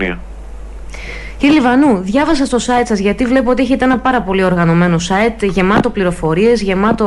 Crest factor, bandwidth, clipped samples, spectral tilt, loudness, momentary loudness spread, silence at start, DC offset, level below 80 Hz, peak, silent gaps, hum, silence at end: 10 dB; 11.5 kHz; under 0.1%; -6 dB/octave; -13 LUFS; 16 LU; 0 s; under 0.1%; -30 dBFS; -2 dBFS; none; none; 0 s